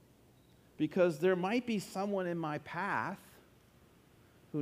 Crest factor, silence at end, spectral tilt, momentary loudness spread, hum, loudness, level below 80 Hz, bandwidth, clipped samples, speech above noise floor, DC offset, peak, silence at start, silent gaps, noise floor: 18 dB; 0 s; -6.5 dB/octave; 9 LU; none; -35 LUFS; -74 dBFS; 15.5 kHz; under 0.1%; 30 dB; under 0.1%; -18 dBFS; 0.8 s; none; -64 dBFS